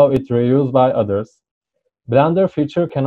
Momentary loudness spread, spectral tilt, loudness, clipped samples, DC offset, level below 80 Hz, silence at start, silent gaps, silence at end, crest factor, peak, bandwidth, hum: 7 LU; -9.5 dB/octave; -16 LUFS; under 0.1%; under 0.1%; -50 dBFS; 0 s; 1.51-1.61 s; 0 s; 14 dB; -2 dBFS; 7.2 kHz; none